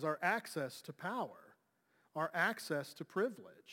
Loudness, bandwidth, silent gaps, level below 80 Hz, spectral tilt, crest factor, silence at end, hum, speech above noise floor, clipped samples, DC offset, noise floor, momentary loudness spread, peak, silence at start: -39 LUFS; 17 kHz; none; under -90 dBFS; -4.5 dB/octave; 20 dB; 0 s; none; 37 dB; under 0.1%; under 0.1%; -77 dBFS; 10 LU; -20 dBFS; 0 s